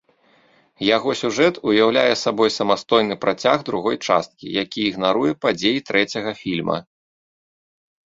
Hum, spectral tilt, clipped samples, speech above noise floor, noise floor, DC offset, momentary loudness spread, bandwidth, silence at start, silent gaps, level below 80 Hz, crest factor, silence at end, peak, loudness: none; -4.5 dB/octave; under 0.1%; 38 dB; -57 dBFS; under 0.1%; 8 LU; 7.8 kHz; 0.8 s; none; -60 dBFS; 20 dB; 1.25 s; 0 dBFS; -20 LUFS